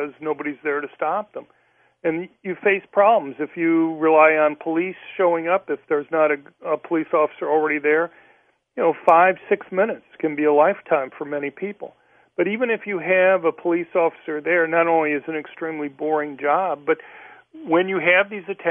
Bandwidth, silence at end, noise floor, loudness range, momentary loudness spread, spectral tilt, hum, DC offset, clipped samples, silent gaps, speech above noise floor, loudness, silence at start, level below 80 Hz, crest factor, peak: 3.6 kHz; 0 s; -59 dBFS; 4 LU; 12 LU; -8 dB/octave; none; under 0.1%; under 0.1%; none; 38 dB; -21 LUFS; 0 s; -74 dBFS; 20 dB; 0 dBFS